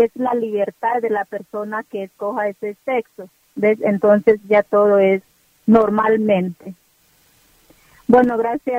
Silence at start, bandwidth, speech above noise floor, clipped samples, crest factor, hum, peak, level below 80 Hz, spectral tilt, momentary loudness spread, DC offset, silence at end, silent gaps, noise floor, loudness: 0 s; 15.5 kHz; 40 dB; under 0.1%; 18 dB; none; 0 dBFS; -56 dBFS; -8 dB/octave; 13 LU; under 0.1%; 0 s; none; -57 dBFS; -18 LUFS